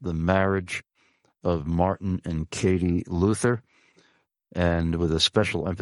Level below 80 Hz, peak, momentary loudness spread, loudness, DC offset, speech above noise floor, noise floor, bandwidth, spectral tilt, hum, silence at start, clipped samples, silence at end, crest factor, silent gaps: -42 dBFS; -6 dBFS; 10 LU; -25 LUFS; under 0.1%; 42 dB; -66 dBFS; 11.5 kHz; -5.5 dB/octave; none; 0 s; under 0.1%; 0 s; 20 dB; none